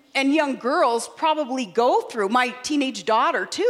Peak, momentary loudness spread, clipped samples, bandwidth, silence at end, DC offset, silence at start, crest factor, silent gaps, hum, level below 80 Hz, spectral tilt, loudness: -6 dBFS; 4 LU; under 0.1%; 14 kHz; 0 s; under 0.1%; 0.15 s; 16 dB; none; none; -74 dBFS; -3 dB/octave; -22 LUFS